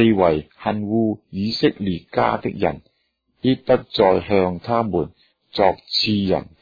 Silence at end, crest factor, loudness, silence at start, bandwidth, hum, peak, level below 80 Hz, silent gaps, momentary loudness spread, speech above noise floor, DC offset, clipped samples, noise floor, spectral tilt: 0.2 s; 18 dB; -20 LUFS; 0 s; 5 kHz; none; -2 dBFS; -48 dBFS; none; 8 LU; 50 dB; under 0.1%; under 0.1%; -69 dBFS; -7.5 dB/octave